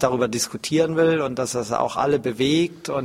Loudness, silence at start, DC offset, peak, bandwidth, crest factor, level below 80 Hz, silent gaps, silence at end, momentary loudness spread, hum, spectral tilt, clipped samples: -22 LUFS; 0 s; under 0.1%; -2 dBFS; 16 kHz; 18 dB; -54 dBFS; none; 0 s; 5 LU; none; -4.5 dB/octave; under 0.1%